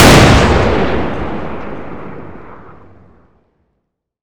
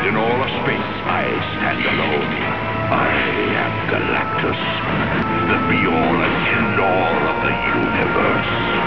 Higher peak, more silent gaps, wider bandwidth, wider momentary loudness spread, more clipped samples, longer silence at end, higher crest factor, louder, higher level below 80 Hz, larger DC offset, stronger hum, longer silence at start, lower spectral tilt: first, 0 dBFS vs -4 dBFS; neither; first, over 20 kHz vs 5.4 kHz; first, 25 LU vs 4 LU; first, 1% vs under 0.1%; about the same, 0 s vs 0 s; about the same, 14 dB vs 14 dB; first, -11 LUFS vs -18 LUFS; first, -22 dBFS vs -40 dBFS; second, under 0.1% vs 1%; neither; about the same, 0 s vs 0 s; second, -5 dB/octave vs -8 dB/octave